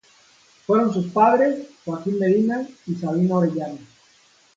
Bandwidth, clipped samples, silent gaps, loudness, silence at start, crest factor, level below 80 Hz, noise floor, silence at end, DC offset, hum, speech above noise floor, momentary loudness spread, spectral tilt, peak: 7.6 kHz; under 0.1%; none; -21 LUFS; 0.7 s; 18 dB; -66 dBFS; -56 dBFS; 0.75 s; under 0.1%; none; 36 dB; 14 LU; -8.5 dB/octave; -4 dBFS